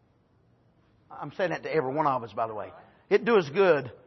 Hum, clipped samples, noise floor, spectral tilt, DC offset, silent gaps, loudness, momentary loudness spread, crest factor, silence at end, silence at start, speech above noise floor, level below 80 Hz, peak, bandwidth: none; under 0.1%; -65 dBFS; -7 dB/octave; under 0.1%; none; -26 LUFS; 17 LU; 18 dB; 0.1 s; 1.1 s; 38 dB; -72 dBFS; -10 dBFS; 6.2 kHz